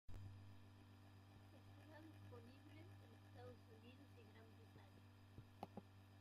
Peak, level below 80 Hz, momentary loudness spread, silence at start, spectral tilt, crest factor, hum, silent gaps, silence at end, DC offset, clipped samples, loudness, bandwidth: -36 dBFS; -74 dBFS; 6 LU; 0.1 s; -6.5 dB/octave; 26 dB; none; none; 0 s; under 0.1%; under 0.1%; -64 LUFS; 15 kHz